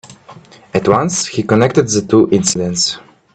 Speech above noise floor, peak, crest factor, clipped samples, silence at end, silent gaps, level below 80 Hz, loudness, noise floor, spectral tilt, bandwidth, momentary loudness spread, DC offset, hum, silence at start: 26 dB; 0 dBFS; 14 dB; under 0.1%; 0.35 s; none; -50 dBFS; -14 LUFS; -40 dBFS; -4.5 dB/octave; 9.4 kHz; 6 LU; under 0.1%; none; 0.05 s